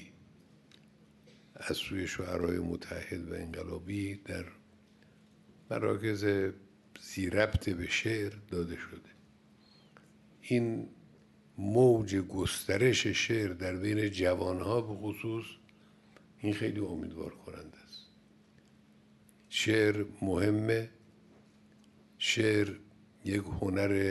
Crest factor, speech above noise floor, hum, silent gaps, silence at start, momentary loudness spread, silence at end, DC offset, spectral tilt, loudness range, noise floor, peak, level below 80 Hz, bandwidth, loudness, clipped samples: 22 dB; 30 dB; none; none; 0 s; 19 LU; 0 s; under 0.1%; -5 dB/octave; 9 LU; -62 dBFS; -12 dBFS; -56 dBFS; 12 kHz; -33 LUFS; under 0.1%